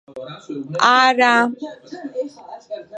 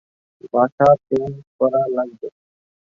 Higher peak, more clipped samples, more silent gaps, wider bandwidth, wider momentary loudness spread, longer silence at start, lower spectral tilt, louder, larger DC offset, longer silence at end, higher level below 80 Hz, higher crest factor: about the same, 0 dBFS vs -2 dBFS; neither; second, none vs 0.72-0.78 s, 1.47-1.59 s; first, 9.2 kHz vs 7.2 kHz; first, 21 LU vs 16 LU; second, 0.1 s vs 0.45 s; second, -3 dB/octave vs -9 dB/octave; first, -16 LUFS vs -19 LUFS; neither; second, 0 s vs 0.7 s; second, -72 dBFS vs -56 dBFS; about the same, 20 dB vs 18 dB